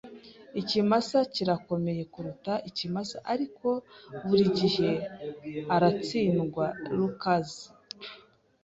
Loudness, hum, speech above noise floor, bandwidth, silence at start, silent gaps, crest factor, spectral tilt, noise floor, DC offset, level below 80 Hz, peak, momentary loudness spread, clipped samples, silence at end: -29 LUFS; none; 28 dB; 8 kHz; 0.05 s; none; 18 dB; -6.5 dB/octave; -56 dBFS; under 0.1%; -64 dBFS; -10 dBFS; 17 LU; under 0.1%; 0.45 s